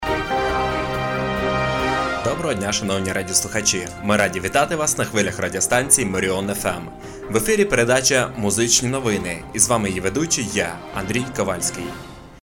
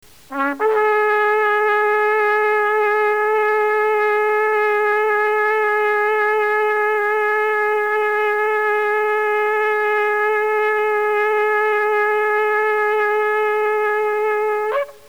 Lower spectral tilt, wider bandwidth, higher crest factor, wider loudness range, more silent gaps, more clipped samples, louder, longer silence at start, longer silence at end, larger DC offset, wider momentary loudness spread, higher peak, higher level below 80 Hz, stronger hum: about the same, -3 dB/octave vs -3 dB/octave; about the same, 19 kHz vs over 20 kHz; first, 18 dB vs 12 dB; about the same, 3 LU vs 1 LU; neither; neither; second, -20 LUFS vs -17 LUFS; second, 0 s vs 0.3 s; about the same, 0.05 s vs 0.15 s; second, under 0.1% vs 0.4%; first, 8 LU vs 2 LU; about the same, -4 dBFS vs -6 dBFS; first, -42 dBFS vs -66 dBFS; neither